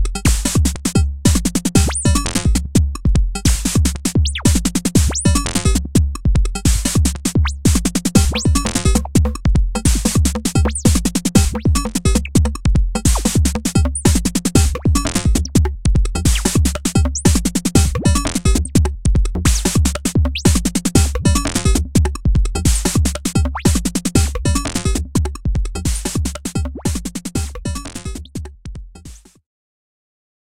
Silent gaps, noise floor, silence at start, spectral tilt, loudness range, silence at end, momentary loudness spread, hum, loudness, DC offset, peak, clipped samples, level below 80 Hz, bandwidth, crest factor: none; -39 dBFS; 0 s; -4.5 dB/octave; 5 LU; 1 s; 6 LU; none; -17 LUFS; 2%; 0 dBFS; under 0.1%; -20 dBFS; 16.5 kHz; 16 dB